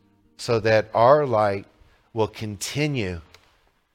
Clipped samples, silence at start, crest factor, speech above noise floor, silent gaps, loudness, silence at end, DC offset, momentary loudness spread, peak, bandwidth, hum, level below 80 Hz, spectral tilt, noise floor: under 0.1%; 0.4 s; 20 dB; 41 dB; none; -22 LUFS; 0.75 s; under 0.1%; 16 LU; -2 dBFS; 16.5 kHz; none; -54 dBFS; -5.5 dB/octave; -62 dBFS